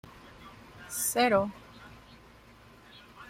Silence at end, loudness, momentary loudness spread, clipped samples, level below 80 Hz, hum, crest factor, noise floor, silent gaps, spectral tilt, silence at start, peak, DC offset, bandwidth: 0.05 s; -28 LUFS; 27 LU; under 0.1%; -62 dBFS; none; 22 dB; -55 dBFS; none; -3 dB/octave; 0.05 s; -12 dBFS; under 0.1%; 16 kHz